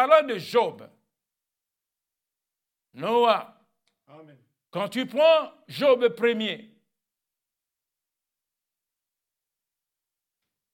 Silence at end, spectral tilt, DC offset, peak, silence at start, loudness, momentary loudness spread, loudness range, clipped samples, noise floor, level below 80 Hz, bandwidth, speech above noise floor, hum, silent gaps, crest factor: 4.1 s; -5 dB/octave; under 0.1%; -6 dBFS; 0 s; -23 LUFS; 13 LU; 5 LU; under 0.1%; -88 dBFS; under -90 dBFS; 16.5 kHz; 64 dB; none; none; 22 dB